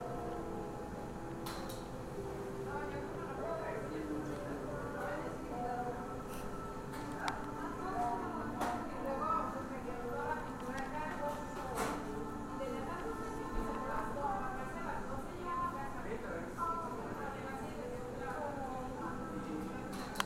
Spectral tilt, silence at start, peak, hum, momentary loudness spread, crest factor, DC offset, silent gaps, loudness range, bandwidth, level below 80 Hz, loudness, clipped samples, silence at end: -5.5 dB/octave; 0 s; -12 dBFS; none; 5 LU; 28 dB; under 0.1%; none; 3 LU; 16.5 kHz; -52 dBFS; -41 LUFS; under 0.1%; 0 s